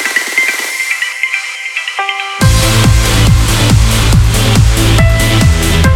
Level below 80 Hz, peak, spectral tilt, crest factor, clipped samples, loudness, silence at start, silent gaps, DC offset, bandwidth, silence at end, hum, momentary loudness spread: -14 dBFS; 0 dBFS; -4 dB/octave; 10 dB; under 0.1%; -10 LUFS; 0 s; none; under 0.1%; 17 kHz; 0 s; none; 6 LU